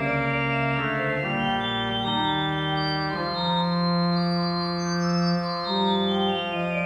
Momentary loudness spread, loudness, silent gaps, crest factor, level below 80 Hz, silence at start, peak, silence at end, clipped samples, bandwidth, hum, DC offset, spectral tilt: 3 LU; -24 LUFS; none; 12 dB; -52 dBFS; 0 s; -12 dBFS; 0 s; under 0.1%; 7.8 kHz; none; under 0.1%; -6 dB/octave